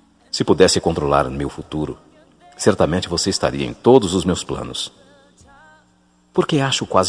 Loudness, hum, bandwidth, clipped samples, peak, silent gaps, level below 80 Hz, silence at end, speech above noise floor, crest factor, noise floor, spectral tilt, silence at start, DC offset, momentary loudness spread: -18 LUFS; none; 10.5 kHz; under 0.1%; 0 dBFS; none; -42 dBFS; 0 s; 39 dB; 20 dB; -57 dBFS; -4.5 dB/octave; 0.35 s; under 0.1%; 13 LU